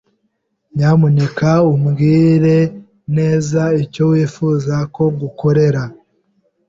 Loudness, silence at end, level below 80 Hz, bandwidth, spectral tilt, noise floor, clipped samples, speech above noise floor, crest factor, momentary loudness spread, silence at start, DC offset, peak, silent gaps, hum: -14 LUFS; 0.75 s; -48 dBFS; 7.6 kHz; -8.5 dB/octave; -67 dBFS; under 0.1%; 54 dB; 12 dB; 9 LU; 0.75 s; under 0.1%; -2 dBFS; none; none